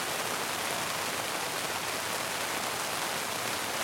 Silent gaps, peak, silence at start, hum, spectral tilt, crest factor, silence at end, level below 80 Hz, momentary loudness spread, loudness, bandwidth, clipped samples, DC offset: none; -14 dBFS; 0 s; none; -1 dB/octave; 20 dB; 0 s; -68 dBFS; 1 LU; -31 LUFS; 16.5 kHz; under 0.1%; under 0.1%